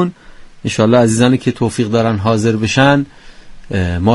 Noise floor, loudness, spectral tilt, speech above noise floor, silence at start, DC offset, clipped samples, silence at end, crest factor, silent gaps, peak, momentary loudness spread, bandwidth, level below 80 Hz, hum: -36 dBFS; -14 LUFS; -6 dB/octave; 23 dB; 0 s; under 0.1%; under 0.1%; 0 s; 14 dB; none; 0 dBFS; 10 LU; 11.5 kHz; -38 dBFS; none